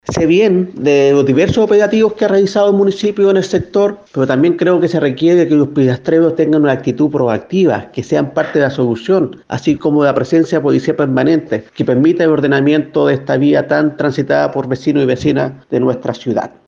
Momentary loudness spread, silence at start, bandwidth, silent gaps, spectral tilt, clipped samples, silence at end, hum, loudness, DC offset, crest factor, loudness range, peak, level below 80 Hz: 6 LU; 0.05 s; 7.6 kHz; none; -7 dB/octave; under 0.1%; 0.2 s; none; -13 LUFS; under 0.1%; 12 dB; 3 LU; 0 dBFS; -48 dBFS